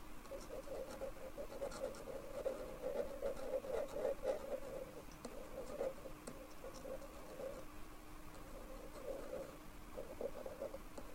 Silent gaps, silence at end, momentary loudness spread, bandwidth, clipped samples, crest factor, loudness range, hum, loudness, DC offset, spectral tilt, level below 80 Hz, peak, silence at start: none; 0 s; 11 LU; 16 kHz; under 0.1%; 18 dB; 7 LU; none; -48 LUFS; under 0.1%; -5 dB/octave; -58 dBFS; -28 dBFS; 0 s